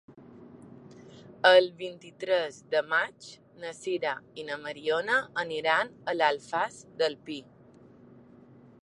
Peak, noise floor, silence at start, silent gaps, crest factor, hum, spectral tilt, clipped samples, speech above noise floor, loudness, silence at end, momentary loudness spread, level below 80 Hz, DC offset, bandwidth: -6 dBFS; -55 dBFS; 0.1 s; none; 24 dB; none; -3.5 dB/octave; under 0.1%; 26 dB; -28 LUFS; 1.4 s; 18 LU; -76 dBFS; under 0.1%; 11 kHz